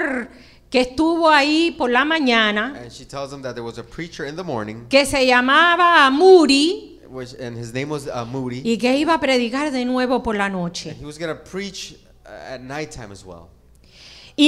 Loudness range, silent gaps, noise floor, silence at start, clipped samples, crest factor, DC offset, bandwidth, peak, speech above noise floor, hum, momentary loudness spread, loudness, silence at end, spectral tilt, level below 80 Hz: 13 LU; none; -48 dBFS; 0 s; under 0.1%; 18 dB; under 0.1%; 13.5 kHz; 0 dBFS; 29 dB; none; 21 LU; -17 LUFS; 0 s; -4 dB/octave; -48 dBFS